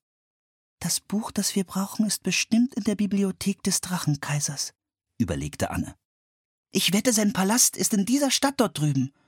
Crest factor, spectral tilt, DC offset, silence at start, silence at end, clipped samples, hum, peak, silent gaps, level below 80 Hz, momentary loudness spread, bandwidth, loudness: 18 dB; -3.5 dB/octave; under 0.1%; 0.8 s; 0.2 s; under 0.1%; none; -6 dBFS; 6.05-6.64 s; -54 dBFS; 9 LU; 17.5 kHz; -24 LUFS